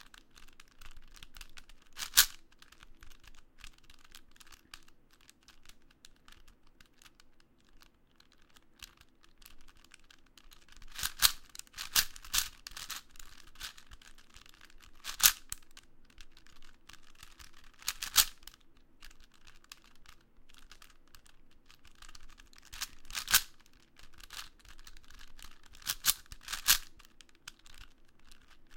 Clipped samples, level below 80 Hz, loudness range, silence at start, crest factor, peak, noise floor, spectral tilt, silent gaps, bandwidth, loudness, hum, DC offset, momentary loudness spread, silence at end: under 0.1%; -54 dBFS; 3 LU; 0 s; 40 dB; 0 dBFS; -64 dBFS; 2 dB/octave; none; 17 kHz; -31 LUFS; none; under 0.1%; 29 LU; 0 s